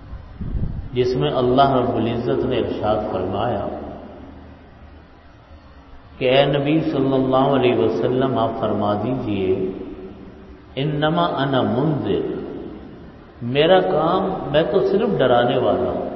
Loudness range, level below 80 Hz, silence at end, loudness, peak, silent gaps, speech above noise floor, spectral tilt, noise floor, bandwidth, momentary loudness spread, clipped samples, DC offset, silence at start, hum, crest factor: 6 LU; -40 dBFS; 0 s; -19 LUFS; -2 dBFS; none; 27 dB; -8.5 dB/octave; -45 dBFS; 6.2 kHz; 18 LU; under 0.1%; under 0.1%; 0 s; none; 18 dB